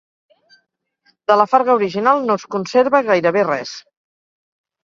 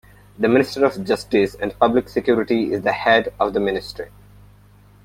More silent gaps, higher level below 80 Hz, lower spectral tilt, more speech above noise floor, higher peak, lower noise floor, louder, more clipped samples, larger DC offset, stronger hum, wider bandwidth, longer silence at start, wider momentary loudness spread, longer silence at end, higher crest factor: neither; second, -66 dBFS vs -48 dBFS; about the same, -5.5 dB/octave vs -6 dB/octave; first, 51 dB vs 30 dB; about the same, 0 dBFS vs -2 dBFS; first, -66 dBFS vs -49 dBFS; first, -16 LUFS vs -19 LUFS; neither; neither; second, none vs 50 Hz at -40 dBFS; second, 7.4 kHz vs 16 kHz; first, 1.3 s vs 0.4 s; first, 11 LU vs 7 LU; about the same, 1.05 s vs 0.95 s; about the same, 18 dB vs 18 dB